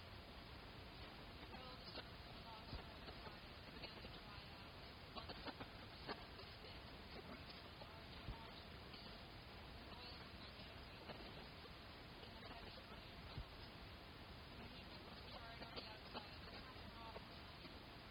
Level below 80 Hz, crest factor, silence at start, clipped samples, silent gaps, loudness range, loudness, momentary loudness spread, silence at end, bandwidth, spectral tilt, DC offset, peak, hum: -64 dBFS; 20 dB; 0 s; under 0.1%; none; 1 LU; -56 LUFS; 4 LU; 0 s; 19.5 kHz; -5.5 dB/octave; under 0.1%; -36 dBFS; none